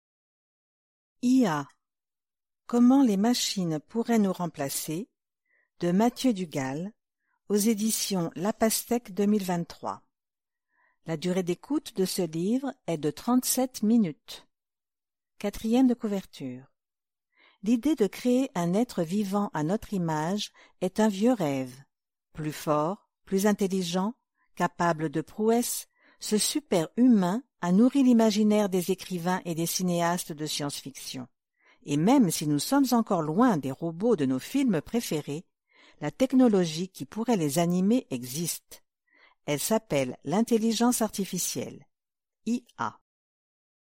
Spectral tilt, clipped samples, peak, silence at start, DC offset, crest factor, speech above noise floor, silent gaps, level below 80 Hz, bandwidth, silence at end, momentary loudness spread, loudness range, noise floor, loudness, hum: -5 dB/octave; under 0.1%; -10 dBFS; 1.25 s; under 0.1%; 18 dB; over 64 dB; none; -64 dBFS; 16 kHz; 1.05 s; 13 LU; 5 LU; under -90 dBFS; -27 LUFS; none